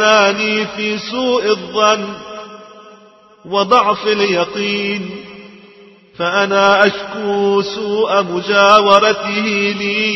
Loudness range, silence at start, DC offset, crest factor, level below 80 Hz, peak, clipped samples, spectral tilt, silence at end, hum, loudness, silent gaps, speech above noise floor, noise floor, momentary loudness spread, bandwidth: 5 LU; 0 s; under 0.1%; 16 dB; -58 dBFS; 0 dBFS; under 0.1%; -3.5 dB/octave; 0 s; none; -14 LUFS; none; 31 dB; -45 dBFS; 13 LU; 8.2 kHz